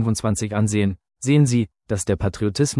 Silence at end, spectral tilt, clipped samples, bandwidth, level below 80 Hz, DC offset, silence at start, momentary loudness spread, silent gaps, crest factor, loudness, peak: 0 s; -6 dB/octave; under 0.1%; 12 kHz; -44 dBFS; under 0.1%; 0 s; 8 LU; none; 14 dB; -21 LUFS; -6 dBFS